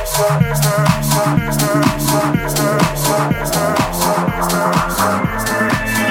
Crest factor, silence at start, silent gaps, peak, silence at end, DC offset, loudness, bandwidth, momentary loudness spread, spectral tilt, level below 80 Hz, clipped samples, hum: 14 dB; 0 s; none; 0 dBFS; 0 s; under 0.1%; -15 LUFS; 17.5 kHz; 2 LU; -4.5 dB/octave; -32 dBFS; under 0.1%; none